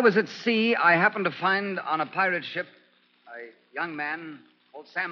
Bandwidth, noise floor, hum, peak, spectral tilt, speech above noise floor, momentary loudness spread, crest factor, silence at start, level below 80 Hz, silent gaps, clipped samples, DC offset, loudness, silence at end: 6.8 kHz; -59 dBFS; none; -8 dBFS; -2.5 dB/octave; 34 dB; 23 LU; 20 dB; 0 s; -84 dBFS; none; under 0.1%; under 0.1%; -25 LUFS; 0 s